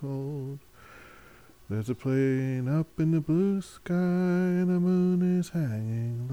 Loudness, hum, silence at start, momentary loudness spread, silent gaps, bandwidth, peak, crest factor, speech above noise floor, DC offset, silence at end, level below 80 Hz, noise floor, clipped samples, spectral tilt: -28 LUFS; none; 0 s; 10 LU; none; 12.5 kHz; -16 dBFS; 12 dB; 28 dB; under 0.1%; 0 s; -60 dBFS; -54 dBFS; under 0.1%; -9 dB/octave